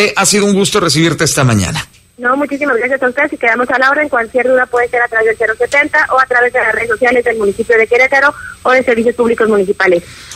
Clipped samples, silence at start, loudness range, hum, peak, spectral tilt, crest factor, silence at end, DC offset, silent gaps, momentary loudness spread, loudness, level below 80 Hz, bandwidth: under 0.1%; 0 s; 2 LU; none; 0 dBFS; -4 dB/octave; 12 dB; 0 s; under 0.1%; none; 5 LU; -11 LUFS; -44 dBFS; 16 kHz